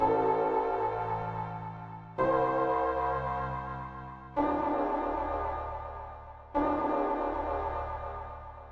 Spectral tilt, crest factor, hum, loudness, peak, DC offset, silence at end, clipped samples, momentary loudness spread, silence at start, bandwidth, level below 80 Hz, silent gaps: -9 dB/octave; 16 dB; none; -32 LUFS; -14 dBFS; under 0.1%; 0 s; under 0.1%; 14 LU; 0 s; 7 kHz; -48 dBFS; none